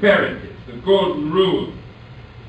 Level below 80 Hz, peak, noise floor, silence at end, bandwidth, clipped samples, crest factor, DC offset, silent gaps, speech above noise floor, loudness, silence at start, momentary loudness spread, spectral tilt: -46 dBFS; -2 dBFS; -39 dBFS; 0 s; 8.2 kHz; under 0.1%; 18 dB; under 0.1%; none; 22 dB; -18 LUFS; 0 s; 23 LU; -7 dB/octave